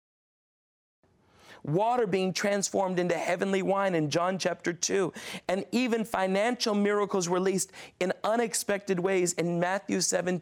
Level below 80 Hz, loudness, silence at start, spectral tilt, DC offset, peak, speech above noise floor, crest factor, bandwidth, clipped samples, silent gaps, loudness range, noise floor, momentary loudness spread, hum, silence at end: -70 dBFS; -28 LUFS; 1.5 s; -4 dB/octave; under 0.1%; -16 dBFS; 29 dB; 14 dB; 17 kHz; under 0.1%; none; 1 LU; -57 dBFS; 5 LU; none; 0 s